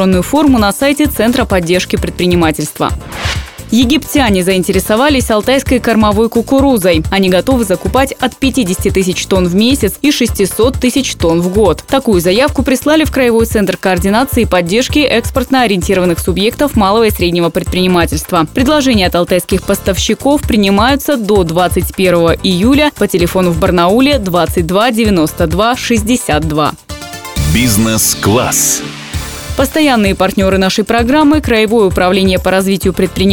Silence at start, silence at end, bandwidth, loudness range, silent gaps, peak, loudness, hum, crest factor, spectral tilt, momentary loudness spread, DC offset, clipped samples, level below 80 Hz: 0 s; 0 s; 20 kHz; 2 LU; none; 0 dBFS; -11 LUFS; none; 10 dB; -4.5 dB/octave; 4 LU; 0.4%; under 0.1%; -26 dBFS